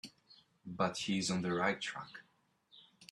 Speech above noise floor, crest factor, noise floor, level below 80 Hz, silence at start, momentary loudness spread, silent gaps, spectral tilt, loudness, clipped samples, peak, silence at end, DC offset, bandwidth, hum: 36 dB; 20 dB; -72 dBFS; -74 dBFS; 0.05 s; 21 LU; none; -4 dB/octave; -36 LUFS; under 0.1%; -18 dBFS; 0.05 s; under 0.1%; 12.5 kHz; none